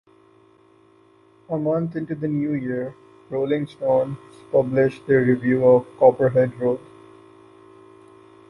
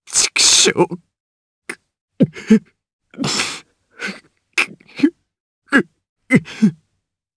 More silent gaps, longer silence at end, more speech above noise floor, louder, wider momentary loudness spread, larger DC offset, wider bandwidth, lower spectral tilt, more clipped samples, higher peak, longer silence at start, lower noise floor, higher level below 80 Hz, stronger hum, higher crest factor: second, none vs 1.20-1.62 s, 2.01-2.08 s, 2.93-2.99 s, 5.40-5.62 s, 6.09-6.16 s; first, 1.7 s vs 0.65 s; second, 35 dB vs 57 dB; second, -21 LUFS vs -16 LUFS; second, 13 LU vs 22 LU; neither; second, 5.6 kHz vs 11 kHz; first, -9.5 dB/octave vs -2.5 dB/octave; neither; about the same, -2 dBFS vs 0 dBFS; first, 1.5 s vs 0.1 s; second, -55 dBFS vs -73 dBFS; about the same, -60 dBFS vs -58 dBFS; neither; about the same, 20 dB vs 20 dB